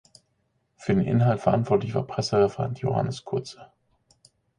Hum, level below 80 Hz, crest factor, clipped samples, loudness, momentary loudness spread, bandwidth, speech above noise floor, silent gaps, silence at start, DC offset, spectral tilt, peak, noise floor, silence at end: none; -54 dBFS; 20 dB; under 0.1%; -25 LUFS; 10 LU; 10.5 kHz; 48 dB; none; 0.8 s; under 0.1%; -7.5 dB/octave; -6 dBFS; -72 dBFS; 0.95 s